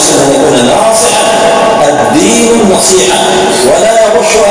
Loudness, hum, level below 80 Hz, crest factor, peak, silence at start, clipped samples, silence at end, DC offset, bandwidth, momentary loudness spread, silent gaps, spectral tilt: -5 LUFS; none; -36 dBFS; 6 dB; 0 dBFS; 0 s; 4%; 0 s; 0.4%; 11 kHz; 2 LU; none; -3 dB/octave